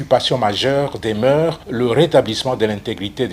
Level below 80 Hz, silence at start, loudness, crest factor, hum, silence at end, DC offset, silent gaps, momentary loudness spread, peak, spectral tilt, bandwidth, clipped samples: -48 dBFS; 0 s; -17 LUFS; 16 dB; none; 0 s; under 0.1%; none; 7 LU; 0 dBFS; -5.5 dB/octave; 16 kHz; under 0.1%